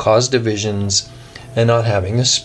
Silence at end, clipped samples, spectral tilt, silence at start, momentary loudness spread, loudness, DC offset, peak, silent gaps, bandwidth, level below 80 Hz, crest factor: 0 s; under 0.1%; -4 dB/octave; 0 s; 10 LU; -16 LUFS; under 0.1%; -2 dBFS; none; 10.5 kHz; -46 dBFS; 16 dB